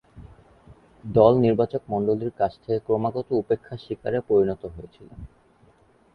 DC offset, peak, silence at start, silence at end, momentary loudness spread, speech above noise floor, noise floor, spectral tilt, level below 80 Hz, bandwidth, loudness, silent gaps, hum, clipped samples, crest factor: under 0.1%; -2 dBFS; 0.15 s; 0.9 s; 23 LU; 35 dB; -58 dBFS; -10 dB/octave; -52 dBFS; 5.2 kHz; -23 LUFS; none; none; under 0.1%; 22 dB